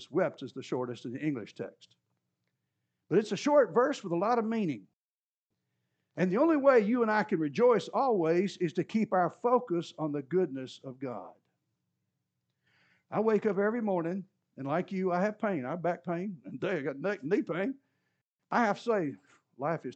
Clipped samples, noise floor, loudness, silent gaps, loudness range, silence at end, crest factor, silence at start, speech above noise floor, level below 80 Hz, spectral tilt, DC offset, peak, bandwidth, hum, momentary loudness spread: under 0.1%; under -90 dBFS; -30 LUFS; 4.93-5.49 s, 18.25-18.37 s; 8 LU; 0 s; 20 dB; 0 s; over 60 dB; under -90 dBFS; -7 dB/octave; under 0.1%; -12 dBFS; 8.6 kHz; none; 14 LU